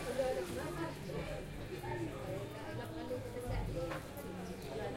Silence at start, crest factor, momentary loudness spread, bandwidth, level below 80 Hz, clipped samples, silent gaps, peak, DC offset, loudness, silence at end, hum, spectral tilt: 0 s; 16 dB; 7 LU; 16 kHz; -52 dBFS; under 0.1%; none; -24 dBFS; under 0.1%; -42 LUFS; 0 s; none; -6 dB/octave